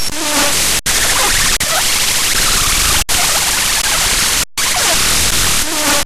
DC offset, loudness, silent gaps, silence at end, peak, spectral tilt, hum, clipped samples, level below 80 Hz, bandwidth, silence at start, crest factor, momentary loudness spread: under 0.1%; -11 LUFS; none; 0 s; -2 dBFS; -0.5 dB/octave; none; under 0.1%; -26 dBFS; 16 kHz; 0 s; 12 dB; 2 LU